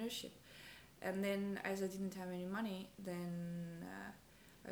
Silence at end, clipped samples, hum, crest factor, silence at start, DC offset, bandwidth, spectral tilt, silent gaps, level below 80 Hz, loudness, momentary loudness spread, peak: 0 s; under 0.1%; none; 18 dB; 0 s; under 0.1%; over 20 kHz; -5.5 dB/octave; none; -74 dBFS; -45 LUFS; 16 LU; -28 dBFS